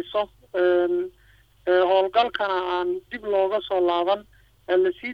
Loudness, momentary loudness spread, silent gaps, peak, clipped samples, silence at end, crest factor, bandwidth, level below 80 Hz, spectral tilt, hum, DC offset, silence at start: -23 LUFS; 9 LU; none; -6 dBFS; under 0.1%; 0 s; 16 dB; 5.2 kHz; -58 dBFS; -6 dB/octave; none; under 0.1%; 0 s